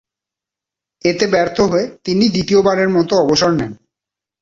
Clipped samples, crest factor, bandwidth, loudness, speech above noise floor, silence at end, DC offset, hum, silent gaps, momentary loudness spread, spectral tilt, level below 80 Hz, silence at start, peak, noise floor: under 0.1%; 14 dB; 7.6 kHz; -15 LUFS; 72 dB; 0.65 s; under 0.1%; none; none; 6 LU; -5 dB/octave; -48 dBFS; 1.05 s; -2 dBFS; -86 dBFS